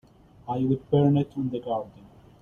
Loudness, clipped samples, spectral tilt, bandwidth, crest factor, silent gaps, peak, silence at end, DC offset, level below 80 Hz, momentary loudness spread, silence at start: -26 LUFS; under 0.1%; -10.5 dB/octave; 3.8 kHz; 18 dB; none; -10 dBFS; 0.5 s; under 0.1%; -58 dBFS; 15 LU; 0.45 s